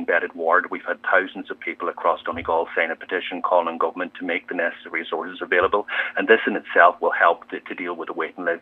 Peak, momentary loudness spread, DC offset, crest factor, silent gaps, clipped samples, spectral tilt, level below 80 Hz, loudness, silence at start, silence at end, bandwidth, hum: 0 dBFS; 11 LU; under 0.1%; 22 dB; none; under 0.1%; -6 dB/octave; -62 dBFS; -22 LUFS; 0 s; 0.05 s; 4.3 kHz; none